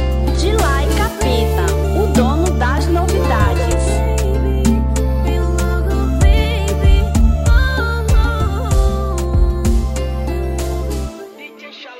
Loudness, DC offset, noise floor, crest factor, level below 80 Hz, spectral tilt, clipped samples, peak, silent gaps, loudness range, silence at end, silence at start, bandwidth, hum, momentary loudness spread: -16 LUFS; under 0.1%; -35 dBFS; 14 dB; -16 dBFS; -6 dB/octave; under 0.1%; 0 dBFS; none; 3 LU; 0 s; 0 s; 16.5 kHz; none; 7 LU